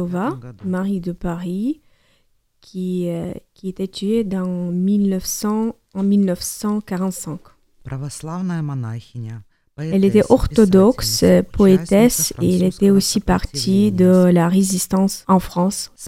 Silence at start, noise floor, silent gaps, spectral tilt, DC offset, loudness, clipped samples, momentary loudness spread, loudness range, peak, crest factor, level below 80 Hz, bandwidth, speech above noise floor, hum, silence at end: 0 s; -61 dBFS; none; -6 dB/octave; under 0.1%; -18 LUFS; under 0.1%; 16 LU; 11 LU; 0 dBFS; 18 dB; -38 dBFS; 16 kHz; 44 dB; none; 0 s